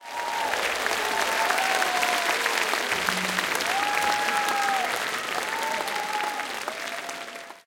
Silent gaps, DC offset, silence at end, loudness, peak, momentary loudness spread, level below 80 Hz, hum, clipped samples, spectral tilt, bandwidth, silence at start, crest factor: none; under 0.1%; 0.05 s; -25 LUFS; -6 dBFS; 8 LU; -64 dBFS; none; under 0.1%; -0.5 dB/octave; 17 kHz; 0 s; 20 dB